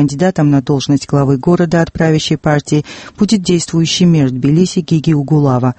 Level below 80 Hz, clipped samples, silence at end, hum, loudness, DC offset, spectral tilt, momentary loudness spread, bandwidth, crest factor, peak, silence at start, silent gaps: -40 dBFS; under 0.1%; 0.05 s; none; -12 LUFS; under 0.1%; -6 dB/octave; 3 LU; 8.8 kHz; 12 dB; 0 dBFS; 0 s; none